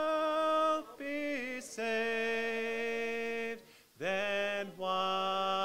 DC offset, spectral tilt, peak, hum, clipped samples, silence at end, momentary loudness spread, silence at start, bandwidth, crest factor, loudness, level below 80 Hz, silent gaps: 0.2%; -3.5 dB/octave; -20 dBFS; none; under 0.1%; 0 s; 8 LU; 0 s; 16 kHz; 14 dB; -34 LUFS; -76 dBFS; none